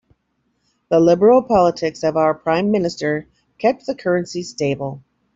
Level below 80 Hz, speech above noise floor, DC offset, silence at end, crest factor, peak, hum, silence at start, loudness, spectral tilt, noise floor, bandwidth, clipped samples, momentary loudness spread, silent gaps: -54 dBFS; 51 dB; under 0.1%; 0.35 s; 16 dB; -2 dBFS; none; 0.9 s; -18 LUFS; -6.5 dB/octave; -68 dBFS; 7.8 kHz; under 0.1%; 11 LU; none